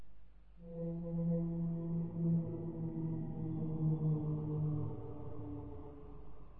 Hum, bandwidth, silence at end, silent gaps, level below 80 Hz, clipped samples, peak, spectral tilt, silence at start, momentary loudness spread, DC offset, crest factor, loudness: none; 2.1 kHz; 0 s; none; -56 dBFS; under 0.1%; -26 dBFS; -13.5 dB/octave; 0 s; 15 LU; 0.2%; 14 dB; -39 LUFS